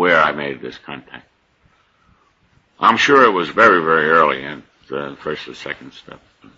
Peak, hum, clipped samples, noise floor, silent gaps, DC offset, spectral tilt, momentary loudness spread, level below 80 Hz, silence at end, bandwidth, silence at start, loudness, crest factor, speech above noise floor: 0 dBFS; none; under 0.1%; -58 dBFS; none; under 0.1%; -4.5 dB/octave; 20 LU; -58 dBFS; 0.4 s; 8 kHz; 0 s; -15 LUFS; 18 dB; 42 dB